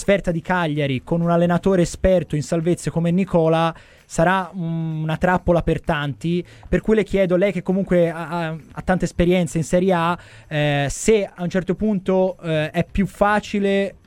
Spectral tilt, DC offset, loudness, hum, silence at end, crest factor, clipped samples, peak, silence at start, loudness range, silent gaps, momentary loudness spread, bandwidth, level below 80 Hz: -6.5 dB/octave; under 0.1%; -20 LUFS; none; 0.15 s; 16 dB; under 0.1%; -2 dBFS; 0 s; 2 LU; none; 7 LU; 13.5 kHz; -38 dBFS